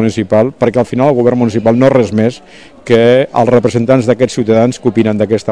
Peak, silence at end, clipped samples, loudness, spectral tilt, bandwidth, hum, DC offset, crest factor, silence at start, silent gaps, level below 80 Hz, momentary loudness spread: 0 dBFS; 0 s; 1%; -11 LUFS; -7 dB/octave; 10.5 kHz; none; 0.8%; 10 dB; 0 s; none; -46 dBFS; 4 LU